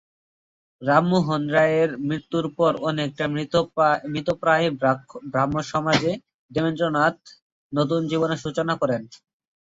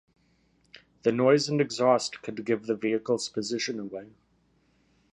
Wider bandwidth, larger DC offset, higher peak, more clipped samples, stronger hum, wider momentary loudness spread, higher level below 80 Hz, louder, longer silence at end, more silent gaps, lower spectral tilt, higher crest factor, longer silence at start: second, 8 kHz vs 11 kHz; neither; first, -2 dBFS vs -8 dBFS; neither; neither; second, 8 LU vs 13 LU; first, -58 dBFS vs -72 dBFS; first, -23 LUFS vs -27 LUFS; second, 0.5 s vs 1.05 s; first, 6.34-6.49 s, 7.42-7.70 s vs none; first, -6 dB/octave vs -4.5 dB/octave; about the same, 20 dB vs 20 dB; second, 0.8 s vs 1.05 s